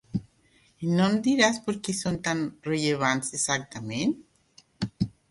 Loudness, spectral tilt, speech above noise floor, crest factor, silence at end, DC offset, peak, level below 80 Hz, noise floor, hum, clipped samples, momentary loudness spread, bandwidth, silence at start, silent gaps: -27 LUFS; -4 dB/octave; 37 dB; 22 dB; 0.2 s; under 0.1%; -6 dBFS; -58 dBFS; -63 dBFS; none; under 0.1%; 13 LU; 11.5 kHz; 0.15 s; none